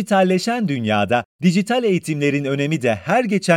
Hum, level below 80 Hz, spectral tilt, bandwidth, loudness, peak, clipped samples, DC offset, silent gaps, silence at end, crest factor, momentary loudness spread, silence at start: none; -64 dBFS; -6 dB/octave; 15.5 kHz; -19 LUFS; -2 dBFS; under 0.1%; under 0.1%; 1.25-1.39 s; 0 s; 16 dB; 4 LU; 0 s